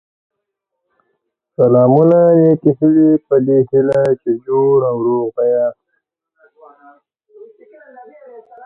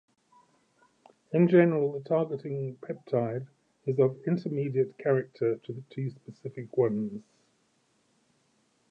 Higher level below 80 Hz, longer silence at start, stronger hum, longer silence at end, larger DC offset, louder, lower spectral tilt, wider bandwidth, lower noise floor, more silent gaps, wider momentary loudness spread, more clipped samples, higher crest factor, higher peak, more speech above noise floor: first, -60 dBFS vs -78 dBFS; first, 1.6 s vs 1.3 s; neither; second, 0 s vs 1.7 s; neither; first, -13 LUFS vs -29 LUFS; about the same, -11 dB/octave vs -10 dB/octave; second, 4 kHz vs 5.8 kHz; first, -76 dBFS vs -71 dBFS; neither; second, 8 LU vs 17 LU; neither; second, 14 dB vs 22 dB; first, 0 dBFS vs -8 dBFS; first, 64 dB vs 43 dB